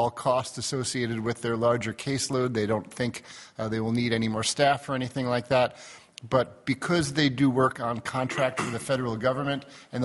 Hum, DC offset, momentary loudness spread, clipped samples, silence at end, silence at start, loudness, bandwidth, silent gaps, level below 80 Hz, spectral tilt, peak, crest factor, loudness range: none; under 0.1%; 8 LU; under 0.1%; 0 s; 0 s; -27 LUFS; 11.5 kHz; none; -60 dBFS; -5 dB/octave; -6 dBFS; 20 dB; 2 LU